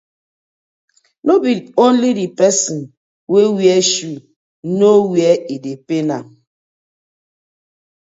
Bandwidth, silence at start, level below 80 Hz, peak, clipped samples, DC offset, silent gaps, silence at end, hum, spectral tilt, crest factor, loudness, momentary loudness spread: 8 kHz; 1.25 s; -68 dBFS; 0 dBFS; under 0.1%; under 0.1%; 2.97-3.27 s, 4.36-4.63 s; 1.8 s; none; -4.5 dB/octave; 16 dB; -14 LUFS; 14 LU